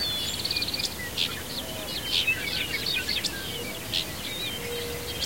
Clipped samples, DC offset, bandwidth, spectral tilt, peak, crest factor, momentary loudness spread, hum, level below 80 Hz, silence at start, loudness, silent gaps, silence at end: under 0.1%; 0.4%; 16.5 kHz; -2 dB/octave; -12 dBFS; 20 dB; 7 LU; none; -48 dBFS; 0 s; -28 LUFS; none; 0 s